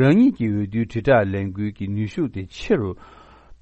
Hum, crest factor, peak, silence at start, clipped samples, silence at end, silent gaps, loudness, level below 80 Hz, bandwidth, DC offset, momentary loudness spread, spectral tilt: none; 18 dB; -4 dBFS; 0 s; under 0.1%; 0.1 s; none; -22 LUFS; -46 dBFS; 8.4 kHz; under 0.1%; 11 LU; -8.5 dB/octave